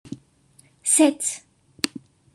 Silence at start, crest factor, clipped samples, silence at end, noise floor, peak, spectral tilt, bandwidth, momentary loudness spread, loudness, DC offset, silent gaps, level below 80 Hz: 0.05 s; 24 dB; under 0.1%; 0.5 s; -58 dBFS; -2 dBFS; -2 dB/octave; 13 kHz; 22 LU; -21 LUFS; under 0.1%; none; -68 dBFS